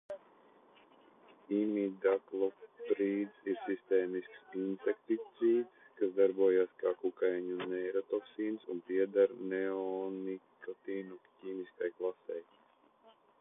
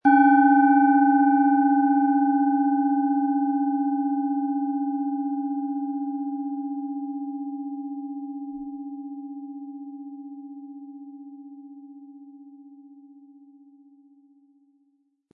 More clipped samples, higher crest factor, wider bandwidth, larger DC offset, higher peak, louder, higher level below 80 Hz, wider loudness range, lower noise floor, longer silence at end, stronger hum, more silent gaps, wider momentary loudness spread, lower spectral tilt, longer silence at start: neither; about the same, 18 dB vs 18 dB; first, 3.8 kHz vs 2.5 kHz; neither; second, -18 dBFS vs -6 dBFS; second, -35 LUFS vs -23 LUFS; second, -86 dBFS vs -76 dBFS; second, 7 LU vs 23 LU; about the same, -67 dBFS vs -68 dBFS; second, 1 s vs 2.5 s; neither; neither; second, 14 LU vs 24 LU; about the same, -9 dB/octave vs -9 dB/octave; about the same, 0.1 s vs 0.05 s